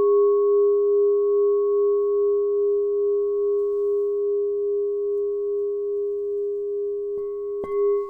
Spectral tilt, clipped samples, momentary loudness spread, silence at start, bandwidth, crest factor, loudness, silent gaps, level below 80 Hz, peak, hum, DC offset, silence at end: -9.5 dB/octave; under 0.1%; 8 LU; 0 s; 2.2 kHz; 10 dB; -22 LUFS; none; -62 dBFS; -12 dBFS; none; under 0.1%; 0 s